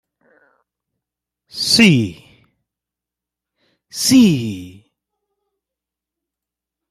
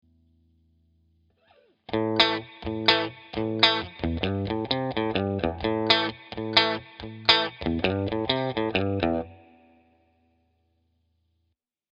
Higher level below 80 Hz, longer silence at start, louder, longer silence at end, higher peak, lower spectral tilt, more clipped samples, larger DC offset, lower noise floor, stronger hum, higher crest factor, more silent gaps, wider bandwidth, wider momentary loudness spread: second, -56 dBFS vs -50 dBFS; second, 1.55 s vs 1.9 s; first, -14 LUFS vs -25 LUFS; second, 2.2 s vs 2.6 s; about the same, -2 dBFS vs 0 dBFS; second, -4 dB/octave vs -5.5 dB/octave; neither; neither; first, -86 dBFS vs -77 dBFS; first, 60 Hz at -45 dBFS vs none; second, 20 dB vs 28 dB; neither; first, 14.5 kHz vs 8.2 kHz; first, 21 LU vs 11 LU